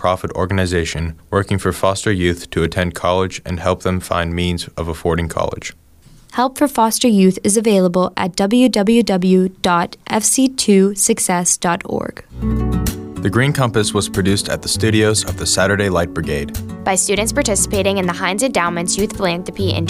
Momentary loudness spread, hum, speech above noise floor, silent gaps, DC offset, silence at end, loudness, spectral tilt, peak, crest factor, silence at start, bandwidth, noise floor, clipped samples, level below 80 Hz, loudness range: 9 LU; none; 28 dB; none; under 0.1%; 0 s; -16 LUFS; -4.5 dB/octave; -2 dBFS; 14 dB; 0 s; 16 kHz; -45 dBFS; under 0.1%; -34 dBFS; 5 LU